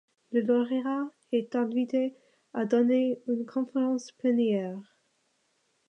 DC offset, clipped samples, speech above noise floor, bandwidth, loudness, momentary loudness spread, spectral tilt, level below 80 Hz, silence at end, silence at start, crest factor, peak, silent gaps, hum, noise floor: under 0.1%; under 0.1%; 45 dB; 8 kHz; -29 LUFS; 9 LU; -6.5 dB/octave; -84 dBFS; 1.05 s; 0.3 s; 16 dB; -14 dBFS; none; none; -73 dBFS